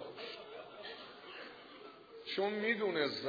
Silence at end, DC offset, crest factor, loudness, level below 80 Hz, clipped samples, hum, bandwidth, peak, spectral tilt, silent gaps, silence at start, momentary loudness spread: 0 s; under 0.1%; 20 dB; -39 LUFS; -84 dBFS; under 0.1%; none; 5 kHz; -20 dBFS; -1.5 dB/octave; none; 0 s; 19 LU